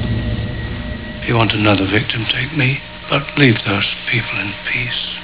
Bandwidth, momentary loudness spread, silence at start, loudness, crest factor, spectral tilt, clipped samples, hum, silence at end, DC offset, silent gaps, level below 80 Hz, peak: 4 kHz; 11 LU; 0 s; -17 LUFS; 18 dB; -9.5 dB/octave; under 0.1%; none; 0 s; 0.6%; none; -32 dBFS; 0 dBFS